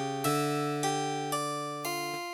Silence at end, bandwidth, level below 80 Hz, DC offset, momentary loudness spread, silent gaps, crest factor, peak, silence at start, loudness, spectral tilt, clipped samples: 0 s; 18 kHz; -76 dBFS; under 0.1%; 5 LU; none; 14 dB; -18 dBFS; 0 s; -31 LUFS; -4 dB/octave; under 0.1%